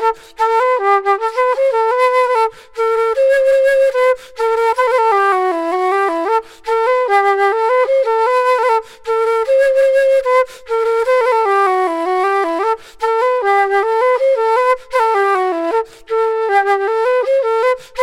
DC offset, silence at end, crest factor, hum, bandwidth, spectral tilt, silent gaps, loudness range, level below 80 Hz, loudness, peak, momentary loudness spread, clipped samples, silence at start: under 0.1%; 0 s; 10 dB; none; 13 kHz; -2 dB/octave; none; 1 LU; -56 dBFS; -14 LUFS; -4 dBFS; 6 LU; under 0.1%; 0 s